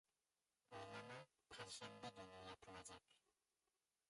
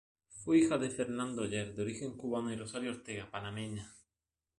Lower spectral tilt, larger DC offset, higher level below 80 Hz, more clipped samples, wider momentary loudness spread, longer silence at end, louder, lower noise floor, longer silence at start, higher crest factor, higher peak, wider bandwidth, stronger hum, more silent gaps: second, -3 dB/octave vs -5 dB/octave; neither; second, -84 dBFS vs -66 dBFS; neither; second, 7 LU vs 15 LU; first, 0.9 s vs 0.6 s; second, -58 LUFS vs -36 LUFS; about the same, under -90 dBFS vs under -90 dBFS; first, 0.7 s vs 0.3 s; about the same, 18 dB vs 20 dB; second, -42 dBFS vs -18 dBFS; about the same, 11.5 kHz vs 11.5 kHz; neither; neither